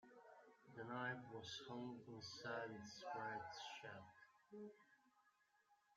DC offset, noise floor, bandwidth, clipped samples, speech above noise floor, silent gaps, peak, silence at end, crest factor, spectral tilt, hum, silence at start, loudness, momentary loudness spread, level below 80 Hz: under 0.1%; -80 dBFS; 13 kHz; under 0.1%; 27 dB; none; -34 dBFS; 0 s; 20 dB; -4 dB/octave; none; 0.05 s; -53 LUFS; 16 LU; -90 dBFS